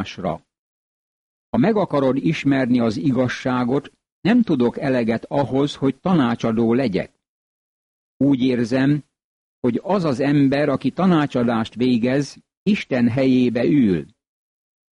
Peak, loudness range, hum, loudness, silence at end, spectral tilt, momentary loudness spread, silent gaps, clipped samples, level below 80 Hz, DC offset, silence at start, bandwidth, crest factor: -8 dBFS; 2 LU; none; -20 LUFS; 0.9 s; -7.5 dB/octave; 8 LU; 0.58-1.53 s, 4.12-4.23 s, 7.29-8.20 s, 9.24-9.62 s, 12.57-12.66 s; under 0.1%; -54 dBFS; under 0.1%; 0 s; 10 kHz; 12 dB